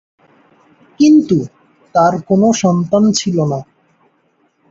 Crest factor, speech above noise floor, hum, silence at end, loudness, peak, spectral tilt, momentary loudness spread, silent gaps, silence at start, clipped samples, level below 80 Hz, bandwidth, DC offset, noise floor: 14 dB; 47 dB; none; 1.05 s; -13 LUFS; -2 dBFS; -6 dB/octave; 9 LU; none; 1 s; under 0.1%; -54 dBFS; 8 kHz; under 0.1%; -59 dBFS